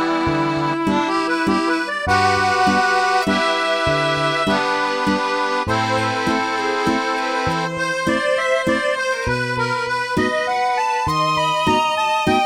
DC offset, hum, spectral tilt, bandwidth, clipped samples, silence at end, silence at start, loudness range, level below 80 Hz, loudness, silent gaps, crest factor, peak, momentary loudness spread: 0.1%; none; -4.5 dB/octave; 15.5 kHz; under 0.1%; 0 s; 0 s; 2 LU; -44 dBFS; -18 LUFS; none; 14 dB; -4 dBFS; 4 LU